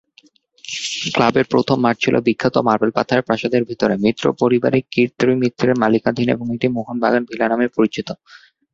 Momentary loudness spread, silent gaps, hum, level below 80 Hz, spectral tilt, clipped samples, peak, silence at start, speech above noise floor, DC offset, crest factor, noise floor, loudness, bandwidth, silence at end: 5 LU; none; none; -54 dBFS; -5.5 dB/octave; under 0.1%; -2 dBFS; 0.65 s; 36 dB; under 0.1%; 16 dB; -53 dBFS; -18 LUFS; 8 kHz; 0.6 s